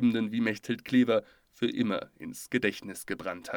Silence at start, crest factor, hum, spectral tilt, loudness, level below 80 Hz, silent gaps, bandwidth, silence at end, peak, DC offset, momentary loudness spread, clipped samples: 0 s; 16 dB; none; -5.5 dB/octave; -30 LUFS; -68 dBFS; none; 18 kHz; 0 s; -14 dBFS; under 0.1%; 12 LU; under 0.1%